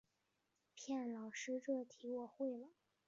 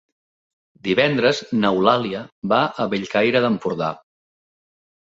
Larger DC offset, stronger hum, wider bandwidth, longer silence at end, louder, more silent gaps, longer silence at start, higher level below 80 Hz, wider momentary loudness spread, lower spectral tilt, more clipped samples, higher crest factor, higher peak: neither; neither; about the same, 7.4 kHz vs 7.8 kHz; second, 0.4 s vs 1.15 s; second, -46 LUFS vs -20 LUFS; second, none vs 2.32-2.42 s; about the same, 0.75 s vs 0.85 s; second, under -90 dBFS vs -60 dBFS; about the same, 12 LU vs 11 LU; second, -3.5 dB/octave vs -6 dB/octave; neither; about the same, 16 dB vs 20 dB; second, -32 dBFS vs -2 dBFS